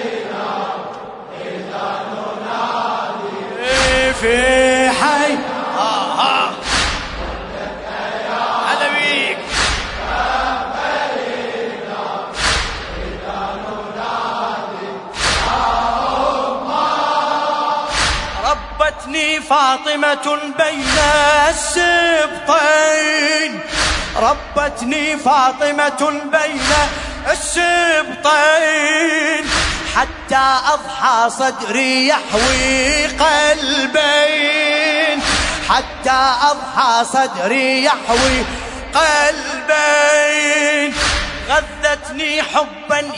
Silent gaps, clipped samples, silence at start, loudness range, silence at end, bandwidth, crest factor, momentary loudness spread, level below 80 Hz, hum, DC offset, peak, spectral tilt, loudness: none; under 0.1%; 0 s; 6 LU; 0 s; 11 kHz; 16 dB; 11 LU; -34 dBFS; none; under 0.1%; 0 dBFS; -2 dB/octave; -15 LUFS